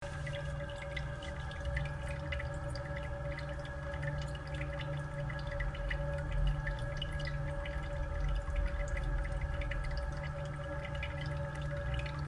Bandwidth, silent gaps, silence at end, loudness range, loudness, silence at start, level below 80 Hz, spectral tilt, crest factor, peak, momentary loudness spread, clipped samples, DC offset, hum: 11.5 kHz; none; 0 s; 2 LU; -39 LUFS; 0 s; -40 dBFS; -6.5 dB/octave; 16 dB; -20 dBFS; 3 LU; under 0.1%; under 0.1%; none